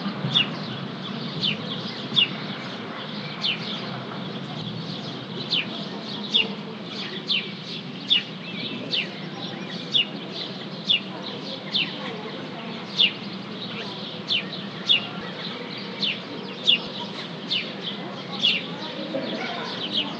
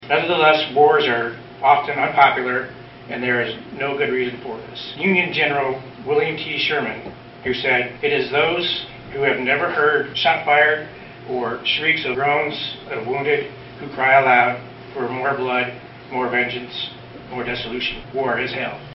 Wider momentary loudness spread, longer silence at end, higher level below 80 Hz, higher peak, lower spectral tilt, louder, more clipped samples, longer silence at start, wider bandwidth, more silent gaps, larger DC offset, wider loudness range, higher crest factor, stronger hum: second, 12 LU vs 16 LU; about the same, 0 s vs 0.05 s; second, -72 dBFS vs -54 dBFS; second, -4 dBFS vs 0 dBFS; first, -4.5 dB/octave vs -1.5 dB/octave; second, -26 LUFS vs -19 LUFS; neither; about the same, 0 s vs 0 s; first, 8.8 kHz vs 6 kHz; neither; neither; about the same, 3 LU vs 4 LU; about the same, 24 dB vs 20 dB; neither